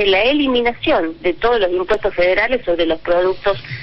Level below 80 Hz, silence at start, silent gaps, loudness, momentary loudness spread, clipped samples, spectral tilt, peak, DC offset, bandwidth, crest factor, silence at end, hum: -38 dBFS; 0 s; none; -16 LUFS; 4 LU; under 0.1%; -6.5 dB/octave; -4 dBFS; under 0.1%; 6 kHz; 12 dB; 0 s; none